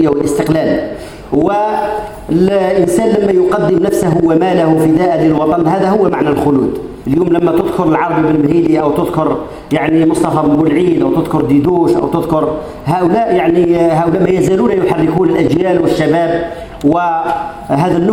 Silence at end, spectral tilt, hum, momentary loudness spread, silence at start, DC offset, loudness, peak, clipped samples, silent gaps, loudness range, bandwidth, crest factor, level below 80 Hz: 0 s; -7.5 dB/octave; none; 6 LU; 0 s; under 0.1%; -12 LUFS; 0 dBFS; under 0.1%; none; 2 LU; 16 kHz; 12 dB; -38 dBFS